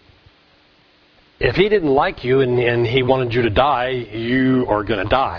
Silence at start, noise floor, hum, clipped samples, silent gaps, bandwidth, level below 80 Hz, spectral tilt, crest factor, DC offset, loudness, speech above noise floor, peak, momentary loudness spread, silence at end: 1.4 s; -54 dBFS; none; under 0.1%; none; 5.4 kHz; -38 dBFS; -8.5 dB/octave; 18 dB; under 0.1%; -17 LUFS; 37 dB; 0 dBFS; 5 LU; 0 s